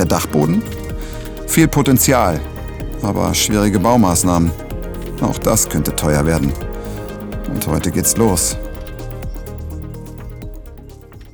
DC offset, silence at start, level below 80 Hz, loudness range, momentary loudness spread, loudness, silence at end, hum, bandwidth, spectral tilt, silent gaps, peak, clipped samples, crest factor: under 0.1%; 0 s; -28 dBFS; 5 LU; 17 LU; -16 LUFS; 0.05 s; none; over 20 kHz; -4.5 dB/octave; none; 0 dBFS; under 0.1%; 16 dB